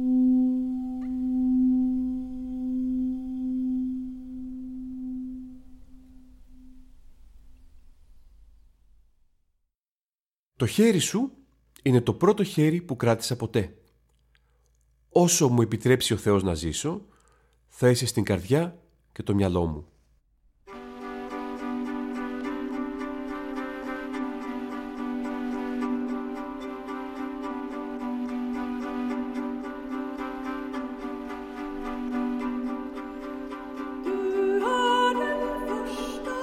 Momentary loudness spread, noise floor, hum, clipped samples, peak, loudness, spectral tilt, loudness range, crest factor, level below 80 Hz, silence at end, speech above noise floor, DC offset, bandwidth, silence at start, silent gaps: 14 LU; under -90 dBFS; none; under 0.1%; -8 dBFS; -28 LUFS; -5.5 dB/octave; 9 LU; 20 dB; -52 dBFS; 0 s; over 67 dB; under 0.1%; 15.5 kHz; 0 s; 9.91-10.09 s, 10.20-10.26 s, 10.34-10.52 s